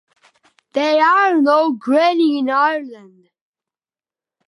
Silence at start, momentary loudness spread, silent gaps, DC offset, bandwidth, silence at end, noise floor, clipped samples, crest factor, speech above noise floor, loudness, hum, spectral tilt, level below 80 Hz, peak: 0.75 s; 11 LU; none; under 0.1%; 11 kHz; 1.5 s; under -90 dBFS; under 0.1%; 16 dB; over 75 dB; -15 LUFS; none; -4 dB/octave; -80 dBFS; -2 dBFS